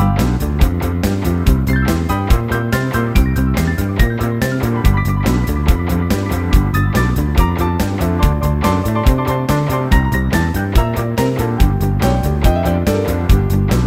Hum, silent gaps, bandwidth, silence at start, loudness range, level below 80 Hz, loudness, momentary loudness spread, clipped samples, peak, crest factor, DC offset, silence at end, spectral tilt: none; none; 16.5 kHz; 0 s; 1 LU; -18 dBFS; -16 LUFS; 2 LU; under 0.1%; 0 dBFS; 14 dB; under 0.1%; 0 s; -6.5 dB/octave